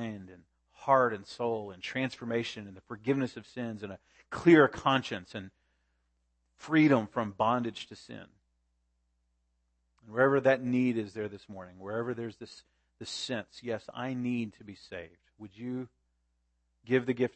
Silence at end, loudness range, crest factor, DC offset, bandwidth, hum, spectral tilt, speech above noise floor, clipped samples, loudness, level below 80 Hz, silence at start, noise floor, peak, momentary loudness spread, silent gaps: 0.05 s; 9 LU; 22 dB; under 0.1%; 8.8 kHz; none; -6 dB/octave; 46 dB; under 0.1%; -30 LUFS; -68 dBFS; 0 s; -76 dBFS; -10 dBFS; 21 LU; none